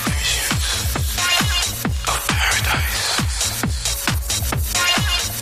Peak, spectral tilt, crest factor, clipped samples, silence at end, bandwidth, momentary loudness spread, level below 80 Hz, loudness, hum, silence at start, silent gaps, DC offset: -4 dBFS; -2 dB/octave; 16 dB; under 0.1%; 0 s; 15.5 kHz; 5 LU; -28 dBFS; -18 LUFS; none; 0 s; none; under 0.1%